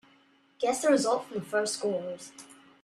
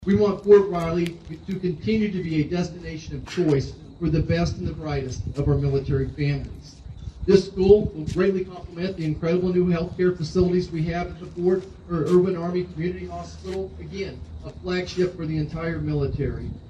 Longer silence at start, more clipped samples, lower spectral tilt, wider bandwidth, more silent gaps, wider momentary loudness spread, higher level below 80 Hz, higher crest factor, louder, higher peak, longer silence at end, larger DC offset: first, 0.6 s vs 0 s; neither; second, -3.5 dB/octave vs -7.5 dB/octave; first, 14 kHz vs 8.8 kHz; neither; first, 18 LU vs 15 LU; second, -74 dBFS vs -40 dBFS; about the same, 18 dB vs 22 dB; second, -29 LUFS vs -24 LUFS; second, -12 dBFS vs -2 dBFS; first, 0.3 s vs 0 s; neither